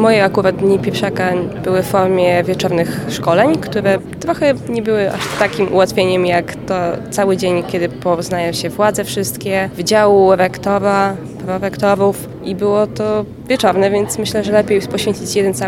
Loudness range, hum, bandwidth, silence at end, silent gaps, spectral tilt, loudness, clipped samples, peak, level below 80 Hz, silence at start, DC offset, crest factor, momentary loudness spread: 2 LU; none; 17 kHz; 0 s; none; -5 dB/octave; -15 LUFS; under 0.1%; 0 dBFS; -46 dBFS; 0 s; under 0.1%; 14 dB; 6 LU